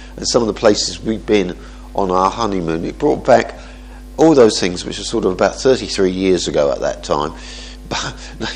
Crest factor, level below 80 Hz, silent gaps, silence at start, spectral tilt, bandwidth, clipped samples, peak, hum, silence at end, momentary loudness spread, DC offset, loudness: 16 dB; -36 dBFS; none; 0 s; -4.5 dB/octave; 10.5 kHz; under 0.1%; 0 dBFS; none; 0 s; 14 LU; under 0.1%; -16 LUFS